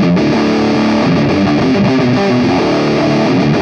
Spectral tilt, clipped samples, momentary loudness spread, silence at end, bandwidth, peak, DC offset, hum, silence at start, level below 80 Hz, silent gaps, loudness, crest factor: -7 dB/octave; under 0.1%; 1 LU; 0 s; 8.6 kHz; -2 dBFS; under 0.1%; none; 0 s; -40 dBFS; none; -12 LUFS; 10 dB